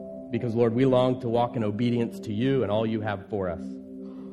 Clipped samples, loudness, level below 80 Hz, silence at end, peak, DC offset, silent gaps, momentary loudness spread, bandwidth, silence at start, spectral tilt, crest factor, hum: under 0.1%; -26 LUFS; -60 dBFS; 0 s; -10 dBFS; under 0.1%; none; 15 LU; 11.5 kHz; 0 s; -8.5 dB/octave; 16 dB; none